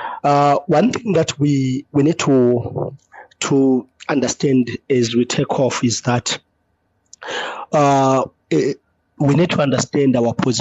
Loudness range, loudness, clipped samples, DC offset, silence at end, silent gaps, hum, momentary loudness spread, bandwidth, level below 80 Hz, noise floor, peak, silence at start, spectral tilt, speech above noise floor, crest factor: 2 LU; -17 LUFS; under 0.1%; under 0.1%; 0 s; none; none; 10 LU; 8.2 kHz; -54 dBFS; -65 dBFS; -6 dBFS; 0 s; -5.5 dB/octave; 49 dB; 12 dB